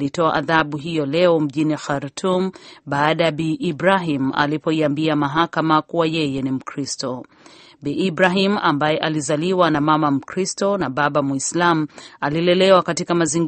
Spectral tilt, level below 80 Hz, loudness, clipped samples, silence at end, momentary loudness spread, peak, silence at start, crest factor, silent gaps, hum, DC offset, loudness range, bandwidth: -5 dB/octave; -56 dBFS; -19 LUFS; under 0.1%; 0 s; 9 LU; 0 dBFS; 0 s; 18 dB; none; none; under 0.1%; 2 LU; 8.8 kHz